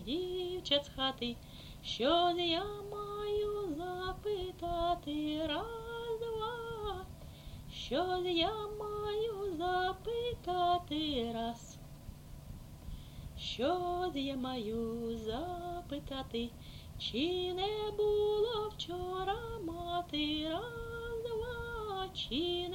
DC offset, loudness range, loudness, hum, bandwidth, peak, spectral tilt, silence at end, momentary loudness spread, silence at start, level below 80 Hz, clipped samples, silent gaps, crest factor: under 0.1%; 4 LU; -37 LUFS; none; 16.5 kHz; -18 dBFS; -5 dB/octave; 0 s; 16 LU; 0 s; -52 dBFS; under 0.1%; none; 20 dB